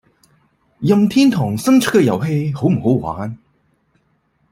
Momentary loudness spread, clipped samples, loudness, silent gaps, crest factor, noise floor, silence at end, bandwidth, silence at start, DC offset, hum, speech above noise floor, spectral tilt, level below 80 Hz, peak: 11 LU; under 0.1%; -16 LUFS; none; 16 dB; -62 dBFS; 1.15 s; 16 kHz; 0.8 s; under 0.1%; none; 47 dB; -6.5 dB/octave; -52 dBFS; -2 dBFS